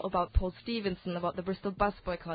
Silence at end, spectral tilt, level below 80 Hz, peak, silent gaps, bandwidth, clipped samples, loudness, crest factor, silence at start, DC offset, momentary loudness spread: 0 s; -5 dB/octave; -40 dBFS; -14 dBFS; none; 4.9 kHz; under 0.1%; -34 LUFS; 18 dB; 0 s; under 0.1%; 5 LU